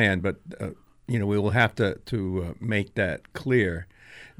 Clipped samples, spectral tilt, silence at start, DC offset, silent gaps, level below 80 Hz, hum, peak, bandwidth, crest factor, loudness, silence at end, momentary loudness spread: under 0.1%; -7 dB/octave; 0 s; under 0.1%; none; -50 dBFS; none; -6 dBFS; 13 kHz; 20 dB; -26 LUFS; 0.15 s; 14 LU